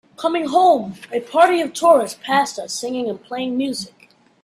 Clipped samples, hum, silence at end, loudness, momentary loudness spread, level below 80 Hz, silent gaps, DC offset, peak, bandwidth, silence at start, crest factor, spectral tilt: under 0.1%; none; 0.55 s; -18 LUFS; 12 LU; -66 dBFS; none; under 0.1%; 0 dBFS; 14 kHz; 0.2 s; 18 dB; -3.5 dB/octave